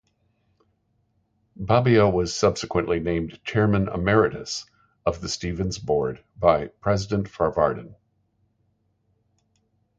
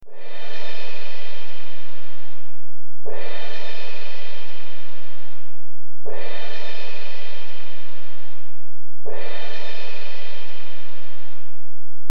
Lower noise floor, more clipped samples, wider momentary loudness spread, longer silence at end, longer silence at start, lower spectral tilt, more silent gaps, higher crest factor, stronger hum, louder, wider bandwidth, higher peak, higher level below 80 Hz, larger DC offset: first, -69 dBFS vs -57 dBFS; neither; second, 10 LU vs 17 LU; first, 2.05 s vs 0 s; first, 1.6 s vs 0 s; about the same, -6 dB/octave vs -5.5 dB/octave; neither; about the same, 20 dB vs 18 dB; neither; first, -23 LUFS vs -37 LUFS; second, 9.2 kHz vs 17.5 kHz; about the same, -4 dBFS vs -6 dBFS; first, -44 dBFS vs -66 dBFS; second, under 0.1% vs 50%